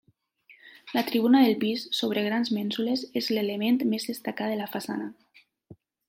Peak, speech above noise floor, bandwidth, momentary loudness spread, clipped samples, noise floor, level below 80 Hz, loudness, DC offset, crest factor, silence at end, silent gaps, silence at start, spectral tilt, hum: -10 dBFS; 34 dB; 16.5 kHz; 12 LU; under 0.1%; -60 dBFS; -76 dBFS; -26 LUFS; under 0.1%; 18 dB; 0.35 s; none; 0.5 s; -5 dB/octave; none